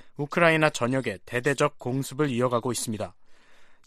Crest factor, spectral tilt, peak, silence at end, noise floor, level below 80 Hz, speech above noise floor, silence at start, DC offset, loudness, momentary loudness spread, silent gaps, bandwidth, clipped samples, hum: 22 dB; -5 dB/octave; -6 dBFS; 0.1 s; -49 dBFS; -60 dBFS; 24 dB; 0.05 s; under 0.1%; -26 LUFS; 10 LU; none; 15 kHz; under 0.1%; none